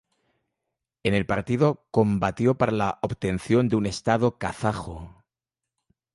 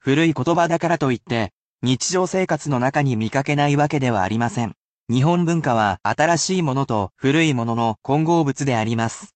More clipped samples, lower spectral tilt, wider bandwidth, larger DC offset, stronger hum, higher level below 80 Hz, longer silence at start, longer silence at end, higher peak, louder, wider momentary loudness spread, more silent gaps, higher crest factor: neither; first, -7 dB/octave vs -5.5 dB/octave; first, 11.5 kHz vs 9 kHz; neither; neither; first, -48 dBFS vs -56 dBFS; first, 1.05 s vs 0.05 s; first, 1.05 s vs 0.1 s; about the same, -6 dBFS vs -4 dBFS; second, -24 LUFS vs -20 LUFS; about the same, 7 LU vs 6 LU; second, none vs 1.53-1.79 s, 4.77-5.07 s; about the same, 18 dB vs 16 dB